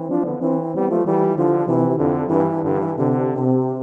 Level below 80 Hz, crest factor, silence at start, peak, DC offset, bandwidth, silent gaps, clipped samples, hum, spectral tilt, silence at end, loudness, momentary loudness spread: -58 dBFS; 16 dB; 0 s; -4 dBFS; under 0.1%; 3.3 kHz; none; under 0.1%; none; -11.5 dB/octave; 0 s; -19 LUFS; 3 LU